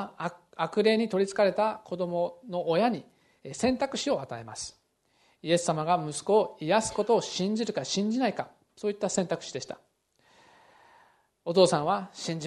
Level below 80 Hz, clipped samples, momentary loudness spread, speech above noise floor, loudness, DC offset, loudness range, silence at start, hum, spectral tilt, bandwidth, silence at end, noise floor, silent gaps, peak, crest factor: -66 dBFS; under 0.1%; 14 LU; 41 dB; -28 LUFS; under 0.1%; 5 LU; 0 s; none; -4.5 dB/octave; 12 kHz; 0 s; -69 dBFS; none; -6 dBFS; 22 dB